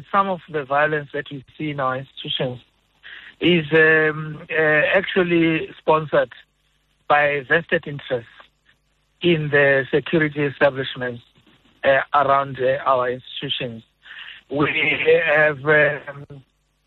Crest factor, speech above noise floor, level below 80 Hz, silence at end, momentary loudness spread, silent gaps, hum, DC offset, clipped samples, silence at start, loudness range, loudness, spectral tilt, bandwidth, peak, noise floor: 16 dB; 45 dB; -58 dBFS; 0.45 s; 14 LU; none; none; under 0.1%; under 0.1%; 0 s; 4 LU; -19 LUFS; -8 dB/octave; 4.4 kHz; -4 dBFS; -65 dBFS